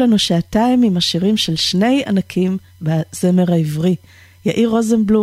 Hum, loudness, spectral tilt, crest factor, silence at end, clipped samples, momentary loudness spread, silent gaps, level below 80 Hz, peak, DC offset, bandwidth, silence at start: none; -16 LUFS; -5.5 dB/octave; 12 dB; 0 s; under 0.1%; 7 LU; none; -46 dBFS; -4 dBFS; under 0.1%; 15.5 kHz; 0 s